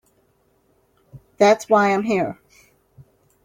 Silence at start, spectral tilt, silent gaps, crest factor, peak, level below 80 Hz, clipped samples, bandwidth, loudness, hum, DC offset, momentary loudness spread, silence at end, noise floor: 1.15 s; -5 dB/octave; none; 18 dB; -4 dBFS; -64 dBFS; under 0.1%; 16 kHz; -18 LUFS; none; under 0.1%; 11 LU; 1.1 s; -63 dBFS